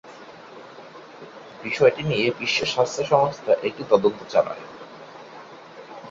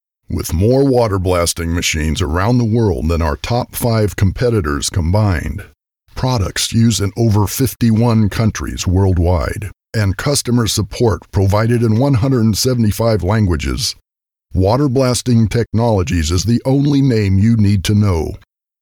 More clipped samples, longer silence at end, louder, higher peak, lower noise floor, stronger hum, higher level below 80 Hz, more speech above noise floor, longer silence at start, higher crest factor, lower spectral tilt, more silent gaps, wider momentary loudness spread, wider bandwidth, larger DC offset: neither; second, 0 s vs 0.45 s; second, -22 LUFS vs -15 LUFS; about the same, -2 dBFS vs -4 dBFS; second, -43 dBFS vs -59 dBFS; neither; second, -60 dBFS vs -28 dBFS; second, 21 dB vs 45 dB; second, 0.05 s vs 0.3 s; first, 22 dB vs 10 dB; about the same, -4.5 dB/octave vs -5.5 dB/octave; neither; first, 23 LU vs 6 LU; second, 7.8 kHz vs 19 kHz; neither